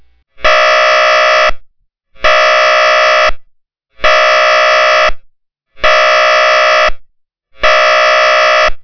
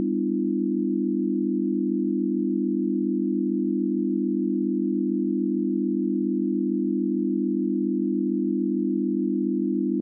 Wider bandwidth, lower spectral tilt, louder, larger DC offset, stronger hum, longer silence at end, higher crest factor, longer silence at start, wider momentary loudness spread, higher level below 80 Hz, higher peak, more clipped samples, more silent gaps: first, 5.4 kHz vs 0.5 kHz; second, -0.5 dB/octave vs -19.5 dB/octave; first, -8 LUFS vs -25 LUFS; neither; neither; about the same, 0 s vs 0 s; about the same, 10 dB vs 10 dB; first, 0.35 s vs 0 s; first, 6 LU vs 0 LU; first, -30 dBFS vs -88 dBFS; first, 0 dBFS vs -16 dBFS; first, 6% vs under 0.1%; neither